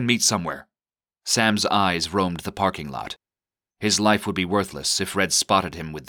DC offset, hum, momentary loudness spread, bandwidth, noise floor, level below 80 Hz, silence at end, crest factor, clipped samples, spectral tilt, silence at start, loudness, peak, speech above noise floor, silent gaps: under 0.1%; none; 13 LU; over 20 kHz; under -90 dBFS; -54 dBFS; 0.05 s; 20 dB; under 0.1%; -3 dB/octave; 0 s; -22 LUFS; -4 dBFS; over 67 dB; none